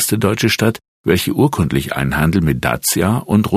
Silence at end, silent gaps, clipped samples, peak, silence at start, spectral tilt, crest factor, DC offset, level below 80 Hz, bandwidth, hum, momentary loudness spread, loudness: 0 s; 0.88-1.04 s; under 0.1%; 0 dBFS; 0 s; -5 dB/octave; 16 dB; under 0.1%; -36 dBFS; 15 kHz; none; 3 LU; -16 LUFS